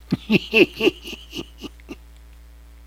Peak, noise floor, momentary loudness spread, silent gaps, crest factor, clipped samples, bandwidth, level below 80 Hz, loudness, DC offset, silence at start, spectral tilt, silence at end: -2 dBFS; -44 dBFS; 25 LU; none; 22 dB; under 0.1%; 16.5 kHz; -44 dBFS; -18 LUFS; under 0.1%; 0.1 s; -5.5 dB/octave; 0.9 s